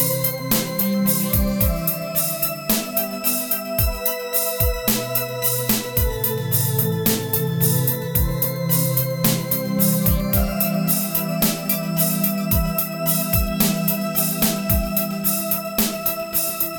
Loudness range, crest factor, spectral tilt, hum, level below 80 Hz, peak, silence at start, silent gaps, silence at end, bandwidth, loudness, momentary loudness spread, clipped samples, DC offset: 1 LU; 18 dB; -4.5 dB/octave; none; -32 dBFS; -4 dBFS; 0 s; none; 0 s; over 20 kHz; -20 LUFS; 3 LU; under 0.1%; under 0.1%